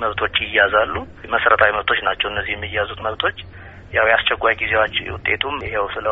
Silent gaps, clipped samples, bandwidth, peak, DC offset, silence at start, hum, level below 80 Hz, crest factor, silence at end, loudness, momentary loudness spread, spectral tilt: none; under 0.1%; 4.7 kHz; 0 dBFS; under 0.1%; 0 s; none; -42 dBFS; 20 dB; 0 s; -18 LUFS; 8 LU; -0.5 dB/octave